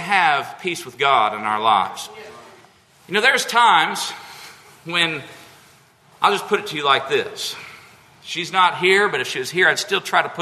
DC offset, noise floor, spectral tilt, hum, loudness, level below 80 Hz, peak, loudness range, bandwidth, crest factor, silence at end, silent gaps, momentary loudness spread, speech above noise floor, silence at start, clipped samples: under 0.1%; -52 dBFS; -2.5 dB/octave; none; -18 LUFS; -70 dBFS; -2 dBFS; 3 LU; 13.5 kHz; 20 dB; 0 s; none; 18 LU; 33 dB; 0 s; under 0.1%